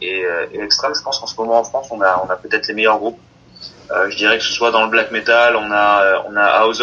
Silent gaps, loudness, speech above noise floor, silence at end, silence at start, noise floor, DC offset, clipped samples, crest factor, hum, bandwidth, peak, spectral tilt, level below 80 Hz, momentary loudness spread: none; -15 LUFS; 23 dB; 0 s; 0 s; -39 dBFS; under 0.1%; under 0.1%; 16 dB; none; 7.4 kHz; 0 dBFS; -2 dB/octave; -54 dBFS; 10 LU